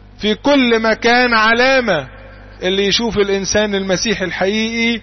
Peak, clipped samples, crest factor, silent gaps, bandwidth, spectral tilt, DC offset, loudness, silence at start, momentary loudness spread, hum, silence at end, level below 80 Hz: -2 dBFS; under 0.1%; 12 dB; none; 6.4 kHz; -3.5 dB/octave; under 0.1%; -14 LUFS; 0.2 s; 8 LU; none; 0 s; -40 dBFS